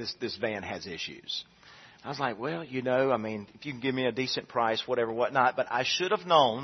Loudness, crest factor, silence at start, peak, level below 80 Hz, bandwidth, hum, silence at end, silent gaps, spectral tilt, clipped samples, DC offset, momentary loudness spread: -29 LUFS; 22 dB; 0 s; -8 dBFS; -70 dBFS; 6.4 kHz; none; 0 s; none; -4.5 dB/octave; under 0.1%; under 0.1%; 12 LU